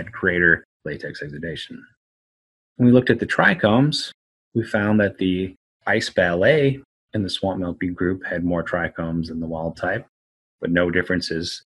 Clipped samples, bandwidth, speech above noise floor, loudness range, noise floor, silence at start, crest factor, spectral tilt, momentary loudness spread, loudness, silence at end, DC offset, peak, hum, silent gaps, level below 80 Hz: under 0.1%; 11.5 kHz; over 69 dB; 6 LU; under -90 dBFS; 0 s; 22 dB; -6 dB/octave; 14 LU; -21 LUFS; 0.05 s; under 0.1%; 0 dBFS; none; 0.65-0.80 s, 1.97-2.75 s, 4.14-4.52 s, 5.57-5.80 s, 6.85-7.08 s, 10.09-10.59 s; -50 dBFS